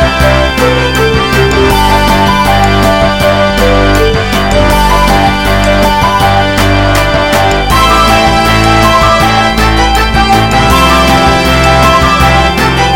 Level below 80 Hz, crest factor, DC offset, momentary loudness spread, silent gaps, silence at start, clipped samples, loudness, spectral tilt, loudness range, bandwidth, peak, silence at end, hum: -16 dBFS; 6 dB; 2%; 3 LU; none; 0 s; 0.5%; -7 LUFS; -4.5 dB/octave; 1 LU; 17.5 kHz; 0 dBFS; 0 s; none